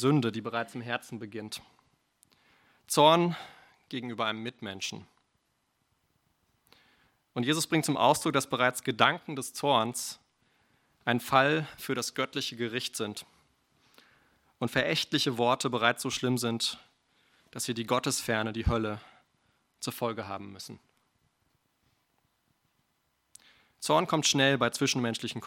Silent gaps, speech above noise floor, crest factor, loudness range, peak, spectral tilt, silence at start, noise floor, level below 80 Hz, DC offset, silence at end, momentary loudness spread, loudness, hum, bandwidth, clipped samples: none; 47 dB; 26 dB; 11 LU; -6 dBFS; -4 dB/octave; 0 s; -76 dBFS; -54 dBFS; under 0.1%; 0 s; 16 LU; -29 LUFS; none; 17 kHz; under 0.1%